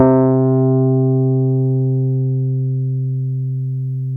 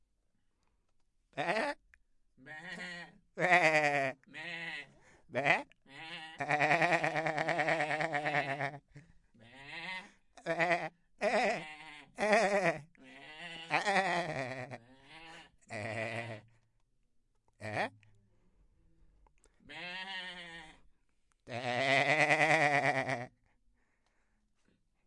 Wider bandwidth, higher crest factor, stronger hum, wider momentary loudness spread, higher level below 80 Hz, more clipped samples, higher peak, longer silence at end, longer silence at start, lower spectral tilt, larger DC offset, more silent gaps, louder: second, 2.1 kHz vs 11.5 kHz; second, 16 dB vs 24 dB; neither; second, 8 LU vs 22 LU; first, -56 dBFS vs -72 dBFS; neither; first, 0 dBFS vs -12 dBFS; second, 0 s vs 1.8 s; second, 0 s vs 1.35 s; first, -14.5 dB/octave vs -4 dB/octave; neither; neither; first, -17 LUFS vs -32 LUFS